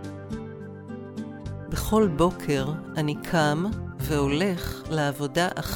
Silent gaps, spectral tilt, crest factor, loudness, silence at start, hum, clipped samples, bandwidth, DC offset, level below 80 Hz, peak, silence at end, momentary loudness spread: none; -5.5 dB/octave; 18 dB; -26 LUFS; 0 s; none; under 0.1%; 17.5 kHz; under 0.1%; -42 dBFS; -8 dBFS; 0 s; 14 LU